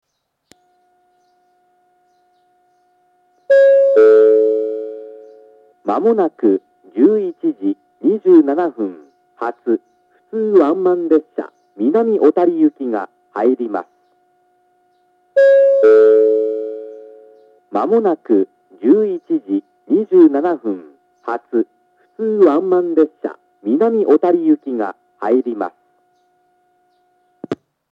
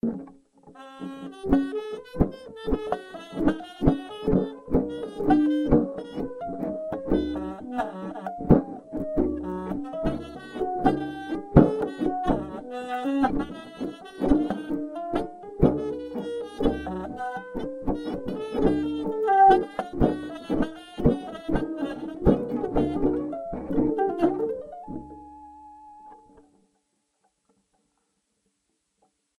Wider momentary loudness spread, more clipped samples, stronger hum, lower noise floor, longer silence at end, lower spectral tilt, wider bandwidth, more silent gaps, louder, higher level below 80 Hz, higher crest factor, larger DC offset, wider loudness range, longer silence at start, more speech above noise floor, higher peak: first, 17 LU vs 14 LU; neither; neither; second, -60 dBFS vs -76 dBFS; second, 0.4 s vs 3.25 s; about the same, -8.5 dB/octave vs -8.5 dB/octave; second, 5.2 kHz vs 10.5 kHz; neither; first, -15 LUFS vs -27 LUFS; second, -80 dBFS vs -40 dBFS; second, 16 dB vs 26 dB; neither; about the same, 4 LU vs 5 LU; first, 3.5 s vs 0.05 s; about the same, 46 dB vs 49 dB; about the same, 0 dBFS vs -2 dBFS